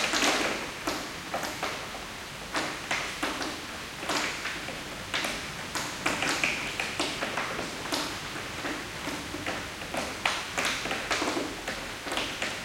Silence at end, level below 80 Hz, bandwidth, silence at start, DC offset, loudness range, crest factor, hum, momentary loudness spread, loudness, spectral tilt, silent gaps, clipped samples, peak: 0 s; -54 dBFS; 17 kHz; 0 s; under 0.1%; 2 LU; 26 dB; none; 8 LU; -31 LUFS; -2 dB/octave; none; under 0.1%; -8 dBFS